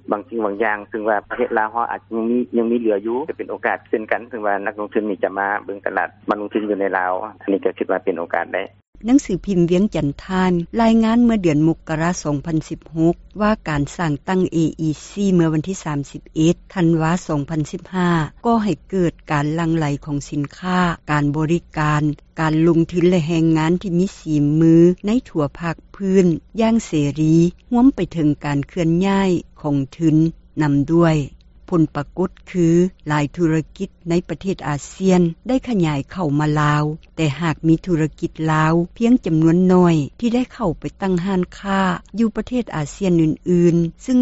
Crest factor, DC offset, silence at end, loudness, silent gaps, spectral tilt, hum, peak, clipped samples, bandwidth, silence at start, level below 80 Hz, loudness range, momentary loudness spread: 16 dB; under 0.1%; 0 s; -19 LUFS; 8.88-8.93 s; -7 dB/octave; none; -2 dBFS; under 0.1%; 8 kHz; 0.1 s; -42 dBFS; 4 LU; 8 LU